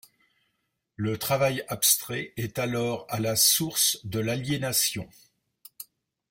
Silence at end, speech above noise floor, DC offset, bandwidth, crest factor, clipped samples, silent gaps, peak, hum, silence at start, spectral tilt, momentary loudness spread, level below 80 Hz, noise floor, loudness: 0.45 s; 51 dB; under 0.1%; 16.5 kHz; 22 dB; under 0.1%; none; -6 dBFS; none; 1 s; -2.5 dB/octave; 19 LU; -62 dBFS; -78 dBFS; -25 LUFS